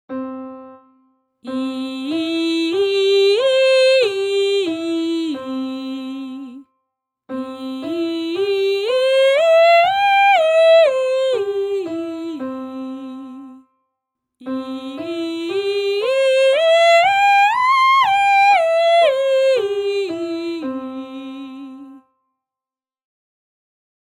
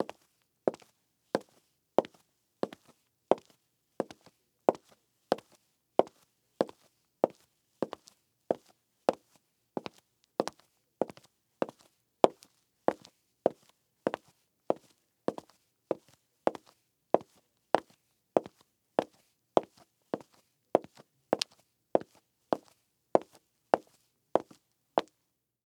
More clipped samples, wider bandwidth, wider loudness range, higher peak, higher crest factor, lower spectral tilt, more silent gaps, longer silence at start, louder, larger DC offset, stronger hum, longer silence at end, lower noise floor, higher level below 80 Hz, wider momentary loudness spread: neither; second, 15 kHz vs 17 kHz; first, 14 LU vs 4 LU; about the same, -4 dBFS vs -2 dBFS; second, 14 dB vs 34 dB; second, -2.5 dB/octave vs -5 dB/octave; neither; about the same, 0.1 s vs 0 s; first, -16 LUFS vs -35 LUFS; neither; neither; first, 2.05 s vs 0.65 s; first, under -90 dBFS vs -81 dBFS; first, -70 dBFS vs -84 dBFS; first, 18 LU vs 11 LU